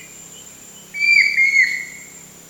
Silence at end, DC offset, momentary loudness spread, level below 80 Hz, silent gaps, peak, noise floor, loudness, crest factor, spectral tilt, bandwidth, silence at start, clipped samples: 0.3 s; under 0.1%; 24 LU; -64 dBFS; none; -2 dBFS; -41 dBFS; -13 LUFS; 18 dB; 1 dB/octave; 19 kHz; 0 s; under 0.1%